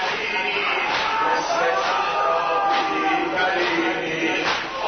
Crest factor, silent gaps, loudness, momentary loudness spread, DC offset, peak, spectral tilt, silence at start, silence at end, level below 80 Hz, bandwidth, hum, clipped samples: 12 dB; none; -21 LUFS; 2 LU; under 0.1%; -8 dBFS; -3 dB/octave; 0 s; 0 s; -56 dBFS; 6.6 kHz; none; under 0.1%